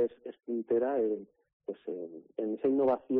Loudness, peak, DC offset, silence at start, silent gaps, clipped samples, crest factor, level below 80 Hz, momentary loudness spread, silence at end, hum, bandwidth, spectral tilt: -33 LUFS; -20 dBFS; under 0.1%; 0 s; 1.53-1.60 s; under 0.1%; 12 dB; -74 dBFS; 14 LU; 0 s; none; 4 kHz; -7 dB/octave